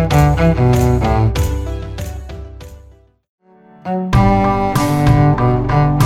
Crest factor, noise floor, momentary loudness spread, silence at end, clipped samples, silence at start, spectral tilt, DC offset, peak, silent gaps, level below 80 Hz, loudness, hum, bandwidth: 14 dB; -44 dBFS; 16 LU; 0 s; under 0.1%; 0 s; -7.5 dB/octave; under 0.1%; 0 dBFS; 3.29-3.38 s; -24 dBFS; -14 LUFS; none; 15.5 kHz